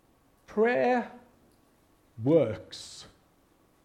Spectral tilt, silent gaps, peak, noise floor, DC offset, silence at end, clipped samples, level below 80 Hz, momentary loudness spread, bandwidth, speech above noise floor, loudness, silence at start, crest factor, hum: -6.5 dB/octave; none; -10 dBFS; -65 dBFS; under 0.1%; 0.8 s; under 0.1%; -68 dBFS; 19 LU; 11 kHz; 38 dB; -27 LUFS; 0.5 s; 20 dB; none